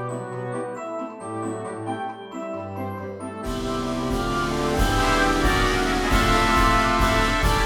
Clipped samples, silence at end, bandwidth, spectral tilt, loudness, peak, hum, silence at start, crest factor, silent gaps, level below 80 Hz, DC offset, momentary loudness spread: under 0.1%; 0 s; 19.5 kHz; -4.5 dB/octave; -23 LUFS; -6 dBFS; none; 0 s; 16 dB; none; -30 dBFS; under 0.1%; 13 LU